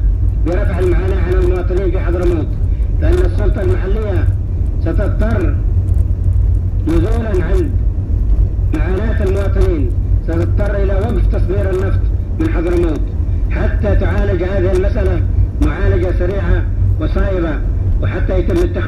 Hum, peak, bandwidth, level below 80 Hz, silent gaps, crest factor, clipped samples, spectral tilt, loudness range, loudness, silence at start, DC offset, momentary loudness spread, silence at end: none; 0 dBFS; 5.8 kHz; -16 dBFS; none; 12 dB; under 0.1%; -9 dB/octave; 1 LU; -16 LUFS; 0 s; under 0.1%; 3 LU; 0 s